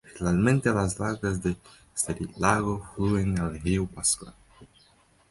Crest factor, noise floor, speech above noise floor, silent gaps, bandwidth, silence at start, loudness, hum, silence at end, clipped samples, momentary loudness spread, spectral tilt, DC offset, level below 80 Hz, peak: 22 dB; -61 dBFS; 35 dB; none; 12 kHz; 0.05 s; -27 LUFS; none; 0.65 s; under 0.1%; 8 LU; -5 dB/octave; under 0.1%; -44 dBFS; -6 dBFS